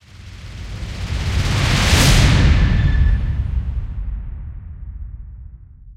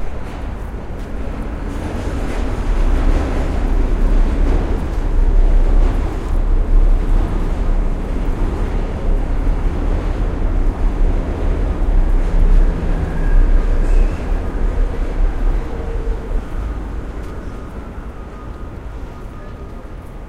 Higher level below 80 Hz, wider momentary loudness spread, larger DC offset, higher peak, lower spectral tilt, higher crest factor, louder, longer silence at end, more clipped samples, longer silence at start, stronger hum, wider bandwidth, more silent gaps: about the same, -20 dBFS vs -16 dBFS; first, 22 LU vs 13 LU; neither; about the same, 0 dBFS vs -2 dBFS; second, -4.5 dB/octave vs -7.5 dB/octave; about the same, 16 dB vs 14 dB; first, -17 LUFS vs -21 LUFS; about the same, 0.05 s vs 0 s; neither; first, 0.15 s vs 0 s; neither; first, 16 kHz vs 4.8 kHz; neither